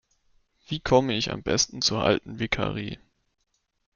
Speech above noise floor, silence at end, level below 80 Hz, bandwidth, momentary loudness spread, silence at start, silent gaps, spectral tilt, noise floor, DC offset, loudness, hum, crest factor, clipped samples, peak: 49 dB; 1 s; -50 dBFS; 7.4 kHz; 13 LU; 0.7 s; none; -3.5 dB/octave; -75 dBFS; under 0.1%; -25 LUFS; none; 22 dB; under 0.1%; -6 dBFS